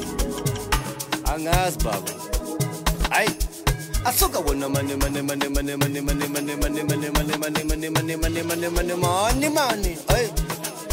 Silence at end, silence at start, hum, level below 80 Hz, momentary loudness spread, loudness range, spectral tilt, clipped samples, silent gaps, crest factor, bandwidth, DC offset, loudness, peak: 0 s; 0 s; none; -30 dBFS; 6 LU; 1 LU; -4 dB/octave; under 0.1%; none; 20 dB; 16.5 kHz; under 0.1%; -24 LUFS; -4 dBFS